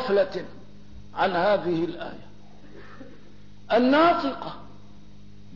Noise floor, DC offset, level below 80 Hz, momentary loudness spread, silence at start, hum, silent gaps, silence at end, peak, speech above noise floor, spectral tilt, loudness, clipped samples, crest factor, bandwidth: -50 dBFS; 0.9%; -56 dBFS; 26 LU; 0 s; 50 Hz at -55 dBFS; none; 0 s; -10 dBFS; 27 dB; -7 dB/octave; -23 LUFS; under 0.1%; 16 dB; 6 kHz